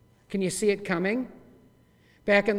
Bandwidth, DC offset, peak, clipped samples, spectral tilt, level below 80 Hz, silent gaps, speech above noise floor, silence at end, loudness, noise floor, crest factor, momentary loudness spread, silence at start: 15 kHz; under 0.1%; -6 dBFS; under 0.1%; -5 dB/octave; -60 dBFS; none; 35 dB; 0 s; -27 LUFS; -60 dBFS; 22 dB; 12 LU; 0.3 s